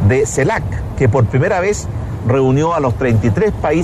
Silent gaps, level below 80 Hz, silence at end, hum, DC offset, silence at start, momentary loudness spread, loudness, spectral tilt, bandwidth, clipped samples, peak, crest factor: none; -30 dBFS; 0 s; none; under 0.1%; 0 s; 7 LU; -15 LUFS; -7 dB/octave; 12.5 kHz; under 0.1%; -2 dBFS; 12 dB